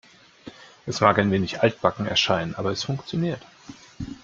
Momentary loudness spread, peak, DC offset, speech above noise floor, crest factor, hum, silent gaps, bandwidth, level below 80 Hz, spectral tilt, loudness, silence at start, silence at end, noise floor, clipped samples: 18 LU; -2 dBFS; under 0.1%; 23 dB; 22 dB; none; none; 7.6 kHz; -56 dBFS; -5 dB/octave; -23 LUFS; 0.45 s; 0.05 s; -46 dBFS; under 0.1%